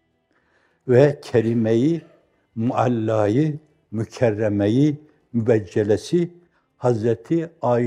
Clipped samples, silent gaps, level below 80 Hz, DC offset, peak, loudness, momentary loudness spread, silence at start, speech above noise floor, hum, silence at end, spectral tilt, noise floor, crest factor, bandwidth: under 0.1%; none; -64 dBFS; under 0.1%; -2 dBFS; -21 LUFS; 11 LU; 0.85 s; 46 dB; none; 0 s; -8 dB/octave; -66 dBFS; 20 dB; 11 kHz